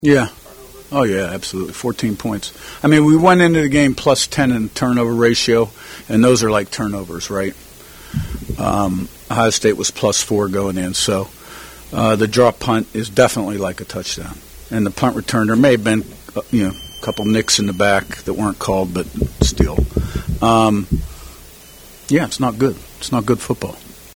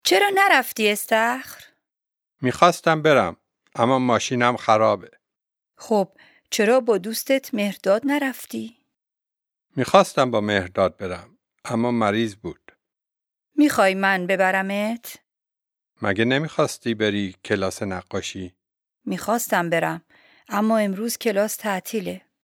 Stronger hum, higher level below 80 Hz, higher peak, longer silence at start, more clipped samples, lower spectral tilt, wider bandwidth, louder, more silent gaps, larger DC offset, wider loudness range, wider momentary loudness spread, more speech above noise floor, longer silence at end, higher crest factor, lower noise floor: neither; first, -32 dBFS vs -64 dBFS; about the same, 0 dBFS vs 0 dBFS; about the same, 0 s vs 0.05 s; neither; about the same, -5 dB/octave vs -4.5 dB/octave; about the same, over 20 kHz vs 19 kHz; first, -17 LUFS vs -21 LUFS; neither; neither; about the same, 5 LU vs 5 LU; about the same, 13 LU vs 15 LU; second, 24 dB vs 67 dB; second, 0.05 s vs 0.25 s; second, 16 dB vs 22 dB; second, -40 dBFS vs -88 dBFS